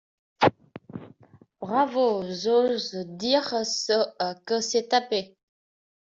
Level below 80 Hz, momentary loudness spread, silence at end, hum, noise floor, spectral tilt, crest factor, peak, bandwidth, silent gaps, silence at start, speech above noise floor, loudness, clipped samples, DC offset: -68 dBFS; 18 LU; 0.75 s; none; -56 dBFS; -3.5 dB/octave; 22 dB; -4 dBFS; 7.8 kHz; none; 0.4 s; 31 dB; -25 LUFS; under 0.1%; under 0.1%